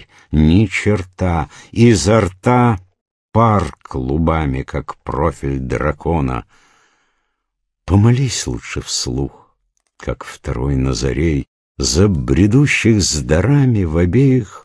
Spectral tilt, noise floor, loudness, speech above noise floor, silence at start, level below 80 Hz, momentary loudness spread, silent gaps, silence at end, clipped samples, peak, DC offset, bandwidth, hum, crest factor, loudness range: -6 dB/octave; -74 dBFS; -16 LUFS; 59 dB; 0 s; -30 dBFS; 12 LU; 3.01-3.29 s, 11.48-11.75 s; 0.05 s; under 0.1%; 0 dBFS; under 0.1%; 11 kHz; none; 14 dB; 6 LU